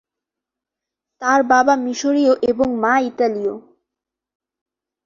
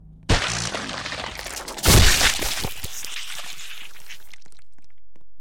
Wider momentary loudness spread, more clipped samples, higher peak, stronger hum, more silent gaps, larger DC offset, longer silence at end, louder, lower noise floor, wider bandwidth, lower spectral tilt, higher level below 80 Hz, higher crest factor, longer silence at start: second, 10 LU vs 24 LU; neither; first, -2 dBFS vs -6 dBFS; neither; neither; neither; first, 1.45 s vs 0 s; first, -17 LUFS vs -21 LUFS; first, -85 dBFS vs -62 dBFS; second, 7.4 kHz vs 17 kHz; first, -4 dB/octave vs -2.5 dB/octave; second, -58 dBFS vs -30 dBFS; about the same, 18 dB vs 18 dB; first, 1.2 s vs 0 s